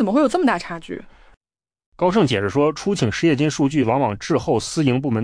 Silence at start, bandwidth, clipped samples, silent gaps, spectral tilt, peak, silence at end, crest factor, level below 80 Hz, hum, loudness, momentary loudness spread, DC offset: 0 s; 10.5 kHz; under 0.1%; 1.37-1.41 s, 1.86-1.92 s; -6 dB/octave; -6 dBFS; 0 s; 14 dB; -50 dBFS; none; -19 LUFS; 7 LU; under 0.1%